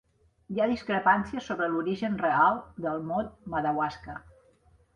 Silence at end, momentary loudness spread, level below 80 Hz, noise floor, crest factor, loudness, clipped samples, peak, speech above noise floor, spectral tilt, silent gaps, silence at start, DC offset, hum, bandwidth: 0.75 s; 10 LU; -58 dBFS; -62 dBFS; 20 dB; -28 LUFS; under 0.1%; -10 dBFS; 34 dB; -7 dB/octave; none; 0.5 s; under 0.1%; none; 9.8 kHz